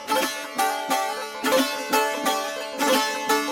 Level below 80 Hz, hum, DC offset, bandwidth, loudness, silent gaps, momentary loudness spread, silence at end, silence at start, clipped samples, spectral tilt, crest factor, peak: -68 dBFS; none; under 0.1%; 17 kHz; -23 LUFS; none; 5 LU; 0 s; 0 s; under 0.1%; -1 dB/octave; 16 dB; -8 dBFS